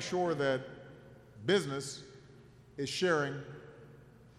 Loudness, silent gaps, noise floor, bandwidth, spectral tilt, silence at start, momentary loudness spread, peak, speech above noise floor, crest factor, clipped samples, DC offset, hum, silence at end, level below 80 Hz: -34 LUFS; none; -57 dBFS; 14 kHz; -4.5 dB/octave; 0 s; 23 LU; -16 dBFS; 24 dB; 20 dB; under 0.1%; under 0.1%; none; 0.1 s; -68 dBFS